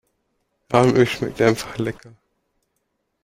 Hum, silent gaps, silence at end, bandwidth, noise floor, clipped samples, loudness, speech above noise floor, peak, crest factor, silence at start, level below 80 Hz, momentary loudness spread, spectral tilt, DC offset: none; none; 1.3 s; 16 kHz; -73 dBFS; under 0.1%; -19 LUFS; 54 dB; -2 dBFS; 22 dB; 0.7 s; -52 dBFS; 12 LU; -6 dB/octave; under 0.1%